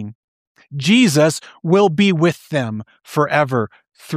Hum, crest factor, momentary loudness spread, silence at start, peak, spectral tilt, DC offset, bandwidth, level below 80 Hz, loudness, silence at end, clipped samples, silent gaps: none; 16 dB; 15 LU; 0 s; -2 dBFS; -5.5 dB/octave; under 0.1%; 15.5 kHz; -62 dBFS; -16 LUFS; 0 s; under 0.1%; 0.15-0.55 s